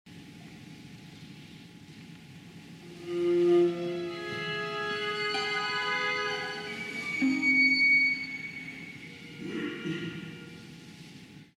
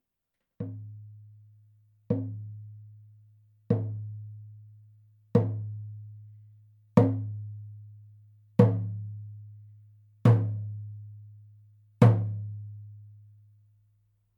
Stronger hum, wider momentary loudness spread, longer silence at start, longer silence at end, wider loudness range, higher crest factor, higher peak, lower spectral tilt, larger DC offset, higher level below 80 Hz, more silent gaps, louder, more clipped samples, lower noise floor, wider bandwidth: neither; about the same, 26 LU vs 25 LU; second, 0.05 s vs 0.6 s; second, 0.15 s vs 1.25 s; about the same, 11 LU vs 9 LU; second, 16 dB vs 26 dB; second, -14 dBFS vs -4 dBFS; second, -4.5 dB/octave vs -10 dB/octave; neither; about the same, -70 dBFS vs -70 dBFS; neither; about the same, -28 LUFS vs -28 LUFS; neither; second, -50 dBFS vs -84 dBFS; first, 12 kHz vs 5.2 kHz